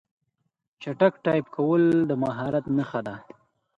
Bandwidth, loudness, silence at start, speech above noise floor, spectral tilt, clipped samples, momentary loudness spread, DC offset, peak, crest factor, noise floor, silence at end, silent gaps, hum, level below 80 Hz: 7.4 kHz; -24 LUFS; 0.8 s; 54 dB; -9 dB/octave; under 0.1%; 16 LU; under 0.1%; -6 dBFS; 20 dB; -78 dBFS; 0.6 s; none; none; -64 dBFS